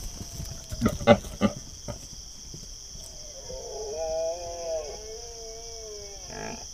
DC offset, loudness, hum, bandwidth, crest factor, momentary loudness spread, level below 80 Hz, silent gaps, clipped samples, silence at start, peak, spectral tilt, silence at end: under 0.1%; -31 LUFS; none; 16 kHz; 28 dB; 17 LU; -44 dBFS; none; under 0.1%; 0 s; -2 dBFS; -4.5 dB/octave; 0 s